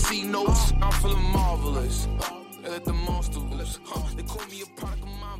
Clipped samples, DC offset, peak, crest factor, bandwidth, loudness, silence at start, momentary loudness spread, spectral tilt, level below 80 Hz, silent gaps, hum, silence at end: under 0.1%; under 0.1%; -12 dBFS; 14 dB; 16 kHz; -28 LUFS; 0 s; 12 LU; -4.5 dB/octave; -26 dBFS; none; none; 0 s